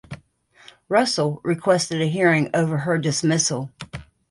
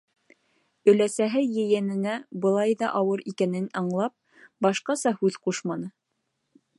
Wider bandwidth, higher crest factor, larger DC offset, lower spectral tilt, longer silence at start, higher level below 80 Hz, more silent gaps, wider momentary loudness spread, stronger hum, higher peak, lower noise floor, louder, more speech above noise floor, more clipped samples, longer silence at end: about the same, 11.5 kHz vs 11.5 kHz; about the same, 18 dB vs 20 dB; neither; about the same, -4.5 dB/octave vs -5.5 dB/octave; second, 0.1 s vs 0.85 s; first, -56 dBFS vs -78 dBFS; neither; first, 19 LU vs 9 LU; neither; about the same, -4 dBFS vs -6 dBFS; second, -54 dBFS vs -78 dBFS; first, -21 LUFS vs -25 LUFS; second, 34 dB vs 53 dB; neither; second, 0.25 s vs 0.9 s